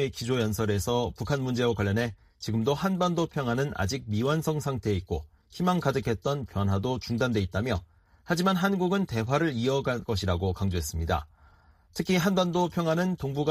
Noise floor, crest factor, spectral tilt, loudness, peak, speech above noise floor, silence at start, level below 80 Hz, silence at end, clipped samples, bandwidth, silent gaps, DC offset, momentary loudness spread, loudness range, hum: -58 dBFS; 16 dB; -6 dB/octave; -28 LUFS; -10 dBFS; 31 dB; 0 s; -46 dBFS; 0 s; under 0.1%; 15.5 kHz; none; under 0.1%; 6 LU; 1 LU; none